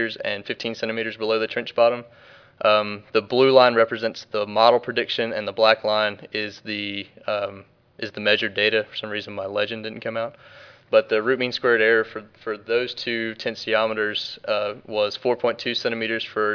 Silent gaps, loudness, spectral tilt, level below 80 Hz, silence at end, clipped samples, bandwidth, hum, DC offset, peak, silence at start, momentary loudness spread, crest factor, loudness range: none; -22 LUFS; -5 dB/octave; -70 dBFS; 0 s; under 0.1%; 5.4 kHz; none; under 0.1%; -2 dBFS; 0 s; 11 LU; 22 dB; 5 LU